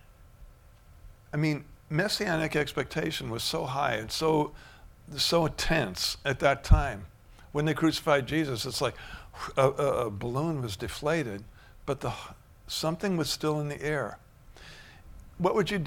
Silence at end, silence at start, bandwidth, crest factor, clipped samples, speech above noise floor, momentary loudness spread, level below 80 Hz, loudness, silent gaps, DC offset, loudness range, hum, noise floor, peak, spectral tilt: 0 s; 0.1 s; 18 kHz; 24 dB; under 0.1%; 26 dB; 13 LU; -40 dBFS; -29 LUFS; none; under 0.1%; 5 LU; none; -54 dBFS; -6 dBFS; -5 dB/octave